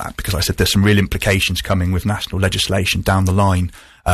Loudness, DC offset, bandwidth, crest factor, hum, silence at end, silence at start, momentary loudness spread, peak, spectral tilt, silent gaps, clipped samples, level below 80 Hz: -17 LUFS; under 0.1%; 14 kHz; 14 dB; none; 0 s; 0 s; 7 LU; -2 dBFS; -5 dB/octave; none; under 0.1%; -30 dBFS